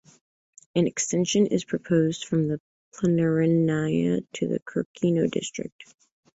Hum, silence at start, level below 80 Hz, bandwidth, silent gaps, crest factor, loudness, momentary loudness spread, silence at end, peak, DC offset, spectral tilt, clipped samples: none; 0.75 s; -62 dBFS; 8 kHz; 2.60-2.92 s, 4.62-4.66 s, 4.85-4.94 s, 5.72-5.79 s; 16 dB; -25 LUFS; 8 LU; 0.55 s; -10 dBFS; under 0.1%; -5.5 dB/octave; under 0.1%